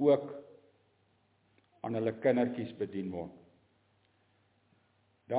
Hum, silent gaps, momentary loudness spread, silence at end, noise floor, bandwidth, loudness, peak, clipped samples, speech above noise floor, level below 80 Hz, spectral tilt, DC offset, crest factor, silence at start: none; none; 16 LU; 0 s; -72 dBFS; 4 kHz; -34 LUFS; -14 dBFS; under 0.1%; 40 dB; -72 dBFS; -6.5 dB/octave; under 0.1%; 22 dB; 0 s